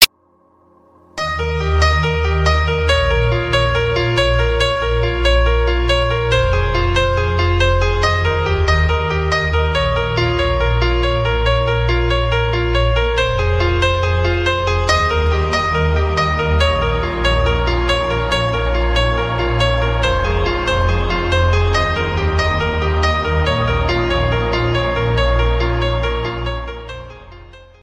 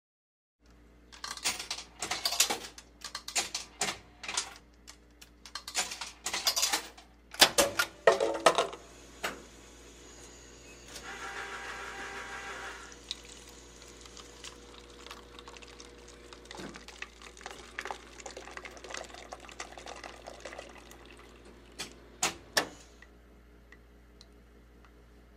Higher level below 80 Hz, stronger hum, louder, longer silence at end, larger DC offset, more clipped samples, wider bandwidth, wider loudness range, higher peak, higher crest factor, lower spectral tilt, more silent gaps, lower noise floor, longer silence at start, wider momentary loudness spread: first, -22 dBFS vs -60 dBFS; second, none vs 60 Hz at -70 dBFS; first, -16 LUFS vs -32 LUFS; first, 0.2 s vs 0 s; neither; neither; about the same, 15.5 kHz vs 16 kHz; second, 1 LU vs 18 LU; first, 0 dBFS vs -6 dBFS; second, 16 dB vs 32 dB; first, -5 dB/octave vs -0.5 dB/octave; neither; about the same, -55 dBFS vs -58 dBFS; second, 0 s vs 0.7 s; second, 3 LU vs 24 LU